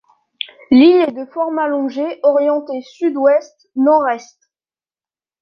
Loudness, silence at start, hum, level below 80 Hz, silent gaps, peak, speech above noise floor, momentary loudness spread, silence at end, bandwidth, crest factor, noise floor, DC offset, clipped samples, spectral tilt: -15 LUFS; 0.7 s; none; -62 dBFS; none; -2 dBFS; over 76 dB; 17 LU; 1.2 s; 6.8 kHz; 14 dB; under -90 dBFS; under 0.1%; under 0.1%; -5 dB/octave